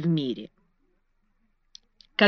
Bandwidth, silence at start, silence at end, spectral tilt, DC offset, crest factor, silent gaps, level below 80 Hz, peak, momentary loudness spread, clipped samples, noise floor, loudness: 6.4 kHz; 0 s; 0 s; -7 dB/octave; under 0.1%; 24 dB; none; -66 dBFS; -6 dBFS; 25 LU; under 0.1%; -69 dBFS; -30 LUFS